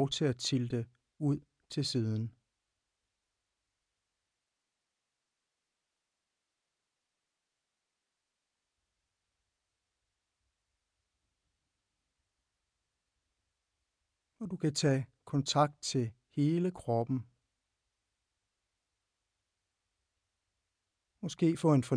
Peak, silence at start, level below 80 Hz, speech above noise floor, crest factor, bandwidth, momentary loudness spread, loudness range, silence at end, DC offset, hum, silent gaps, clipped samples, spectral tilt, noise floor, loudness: -14 dBFS; 0 s; -74 dBFS; 56 dB; 24 dB; 10.5 kHz; 12 LU; 12 LU; 0 s; under 0.1%; none; none; under 0.1%; -6 dB/octave; -88 dBFS; -33 LUFS